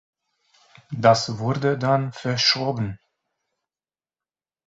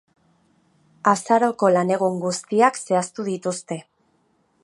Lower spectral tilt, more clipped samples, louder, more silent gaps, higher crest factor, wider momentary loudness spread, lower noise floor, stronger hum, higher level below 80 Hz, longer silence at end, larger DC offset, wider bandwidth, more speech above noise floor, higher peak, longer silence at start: about the same, -5 dB/octave vs -5 dB/octave; neither; about the same, -21 LUFS vs -21 LUFS; neither; about the same, 22 dB vs 20 dB; about the same, 10 LU vs 9 LU; first, under -90 dBFS vs -65 dBFS; neither; first, -58 dBFS vs -74 dBFS; first, 1.7 s vs 0.8 s; neither; second, 7.8 kHz vs 11.5 kHz; first, over 69 dB vs 44 dB; about the same, -2 dBFS vs -2 dBFS; second, 0.9 s vs 1.05 s